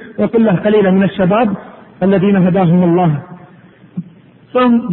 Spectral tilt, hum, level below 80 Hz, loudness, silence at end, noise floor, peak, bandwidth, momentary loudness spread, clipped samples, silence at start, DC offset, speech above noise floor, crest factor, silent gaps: -12.5 dB/octave; none; -48 dBFS; -12 LUFS; 0 s; -42 dBFS; -2 dBFS; 4.1 kHz; 16 LU; under 0.1%; 0 s; under 0.1%; 31 dB; 10 dB; none